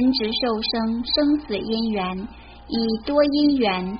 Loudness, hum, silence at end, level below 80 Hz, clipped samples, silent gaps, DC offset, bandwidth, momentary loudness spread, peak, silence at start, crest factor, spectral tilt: -22 LUFS; none; 0 s; -46 dBFS; under 0.1%; none; under 0.1%; 5.4 kHz; 9 LU; -6 dBFS; 0 s; 14 dB; -3.5 dB/octave